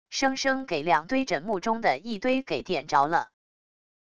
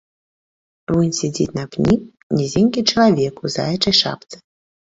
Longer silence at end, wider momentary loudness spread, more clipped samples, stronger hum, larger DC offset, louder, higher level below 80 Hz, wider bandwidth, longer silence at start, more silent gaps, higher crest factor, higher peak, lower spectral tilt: first, 0.7 s vs 0.5 s; second, 5 LU vs 8 LU; neither; neither; first, 0.5% vs under 0.1%; second, -26 LUFS vs -18 LUFS; second, -60 dBFS vs -48 dBFS; first, 10 kHz vs 8 kHz; second, 0.05 s vs 0.9 s; second, none vs 2.23-2.30 s; about the same, 20 dB vs 18 dB; second, -8 dBFS vs -2 dBFS; about the same, -4 dB/octave vs -5 dB/octave